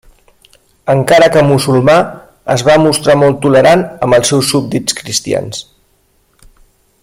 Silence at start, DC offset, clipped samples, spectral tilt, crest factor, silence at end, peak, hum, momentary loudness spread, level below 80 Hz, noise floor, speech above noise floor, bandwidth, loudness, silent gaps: 0.85 s; under 0.1%; under 0.1%; -4.5 dB/octave; 12 dB; 1.4 s; 0 dBFS; none; 10 LU; -44 dBFS; -55 dBFS; 45 dB; 16.5 kHz; -10 LUFS; none